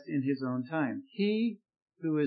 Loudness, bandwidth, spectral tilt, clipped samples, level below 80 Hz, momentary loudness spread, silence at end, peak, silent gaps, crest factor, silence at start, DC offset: -33 LUFS; 5 kHz; -10.5 dB/octave; under 0.1%; under -90 dBFS; 6 LU; 0 s; -18 dBFS; 1.82-1.86 s; 14 dB; 0 s; under 0.1%